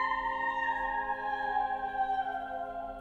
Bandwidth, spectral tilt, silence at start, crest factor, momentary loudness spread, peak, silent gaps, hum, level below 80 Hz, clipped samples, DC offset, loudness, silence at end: 7.8 kHz; -4.5 dB/octave; 0 s; 14 dB; 6 LU; -20 dBFS; none; none; -56 dBFS; under 0.1%; under 0.1%; -33 LUFS; 0 s